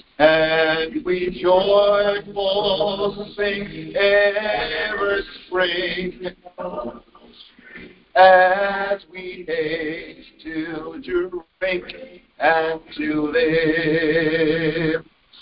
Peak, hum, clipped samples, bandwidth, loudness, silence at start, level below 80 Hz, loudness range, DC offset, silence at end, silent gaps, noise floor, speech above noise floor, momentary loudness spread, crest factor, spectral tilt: 0 dBFS; none; under 0.1%; 5.4 kHz; -20 LUFS; 0.2 s; -50 dBFS; 7 LU; under 0.1%; 0.4 s; none; -47 dBFS; 28 dB; 16 LU; 20 dB; -9.5 dB/octave